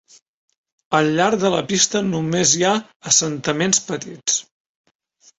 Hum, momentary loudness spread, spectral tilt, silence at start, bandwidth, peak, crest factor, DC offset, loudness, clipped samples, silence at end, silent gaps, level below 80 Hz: none; 7 LU; -3 dB/octave; 0.9 s; 8.4 kHz; 0 dBFS; 20 dB; under 0.1%; -18 LUFS; under 0.1%; 0.95 s; 2.96-3.00 s; -58 dBFS